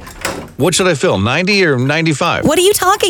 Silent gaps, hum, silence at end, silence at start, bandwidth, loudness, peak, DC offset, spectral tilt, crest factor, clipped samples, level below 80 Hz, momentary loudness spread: none; none; 0 s; 0 s; 19.5 kHz; -13 LUFS; 0 dBFS; under 0.1%; -4 dB/octave; 14 dB; under 0.1%; -42 dBFS; 8 LU